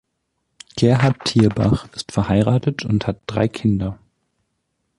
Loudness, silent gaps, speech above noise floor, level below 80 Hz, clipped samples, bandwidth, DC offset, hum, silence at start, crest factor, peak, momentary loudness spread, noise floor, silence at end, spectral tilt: -19 LUFS; none; 55 dB; -42 dBFS; under 0.1%; 11.5 kHz; under 0.1%; none; 0.75 s; 16 dB; -2 dBFS; 8 LU; -73 dBFS; 1.05 s; -7 dB/octave